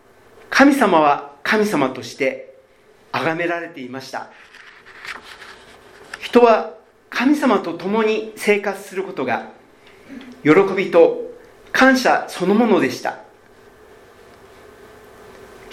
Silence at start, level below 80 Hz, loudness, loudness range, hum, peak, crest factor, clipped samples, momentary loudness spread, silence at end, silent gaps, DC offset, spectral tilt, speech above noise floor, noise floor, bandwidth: 0.5 s; -60 dBFS; -17 LUFS; 10 LU; none; 0 dBFS; 20 dB; under 0.1%; 21 LU; 0 s; none; under 0.1%; -5 dB/octave; 34 dB; -51 dBFS; 16 kHz